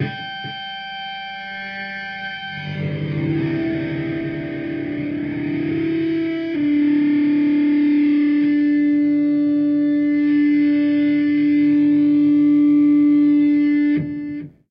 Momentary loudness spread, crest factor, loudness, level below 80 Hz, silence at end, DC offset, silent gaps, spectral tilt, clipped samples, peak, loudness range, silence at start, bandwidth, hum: 14 LU; 8 dB; -18 LUFS; -56 dBFS; 0.2 s; under 0.1%; none; -9 dB/octave; under 0.1%; -10 dBFS; 9 LU; 0 s; 5.2 kHz; 50 Hz at -40 dBFS